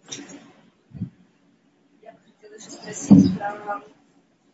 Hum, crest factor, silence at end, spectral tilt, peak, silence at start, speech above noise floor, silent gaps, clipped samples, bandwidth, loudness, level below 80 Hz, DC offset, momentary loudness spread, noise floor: none; 24 dB; 0.75 s; -6.5 dB/octave; 0 dBFS; 0.1 s; 43 dB; none; under 0.1%; 8 kHz; -19 LUFS; -56 dBFS; under 0.1%; 26 LU; -61 dBFS